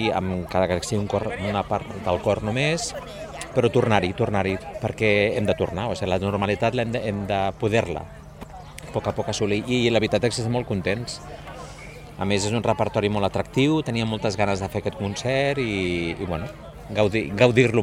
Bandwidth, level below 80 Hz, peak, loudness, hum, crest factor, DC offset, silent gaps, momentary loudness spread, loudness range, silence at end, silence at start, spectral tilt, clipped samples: 15.5 kHz; -46 dBFS; -2 dBFS; -24 LUFS; none; 22 dB; under 0.1%; none; 14 LU; 3 LU; 0 s; 0 s; -5.5 dB/octave; under 0.1%